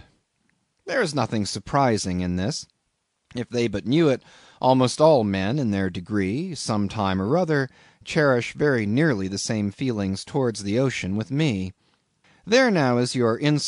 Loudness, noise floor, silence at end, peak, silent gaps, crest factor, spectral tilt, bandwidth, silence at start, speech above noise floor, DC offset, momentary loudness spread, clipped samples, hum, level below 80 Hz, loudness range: -23 LUFS; -74 dBFS; 0 s; -4 dBFS; none; 18 dB; -5.5 dB/octave; 11 kHz; 0.85 s; 52 dB; under 0.1%; 8 LU; under 0.1%; none; -56 dBFS; 4 LU